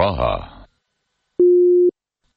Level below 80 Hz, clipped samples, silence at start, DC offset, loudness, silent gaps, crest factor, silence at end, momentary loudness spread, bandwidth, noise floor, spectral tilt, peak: -38 dBFS; under 0.1%; 0 s; under 0.1%; -16 LUFS; none; 14 dB; 0.45 s; 14 LU; 4.9 kHz; -73 dBFS; -10.5 dB/octave; -6 dBFS